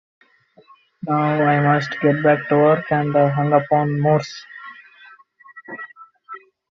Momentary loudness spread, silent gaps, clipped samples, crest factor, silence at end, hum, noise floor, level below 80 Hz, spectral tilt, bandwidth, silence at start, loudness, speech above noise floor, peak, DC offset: 22 LU; none; under 0.1%; 16 dB; 0.35 s; none; -53 dBFS; -60 dBFS; -8 dB/octave; 7.2 kHz; 1.05 s; -18 LUFS; 36 dB; -4 dBFS; under 0.1%